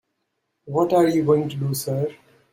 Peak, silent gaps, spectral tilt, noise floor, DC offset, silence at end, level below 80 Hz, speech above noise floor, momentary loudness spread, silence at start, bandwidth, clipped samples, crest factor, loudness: -6 dBFS; none; -6.5 dB/octave; -76 dBFS; under 0.1%; 0.4 s; -62 dBFS; 55 dB; 9 LU; 0.65 s; 16.5 kHz; under 0.1%; 16 dB; -21 LUFS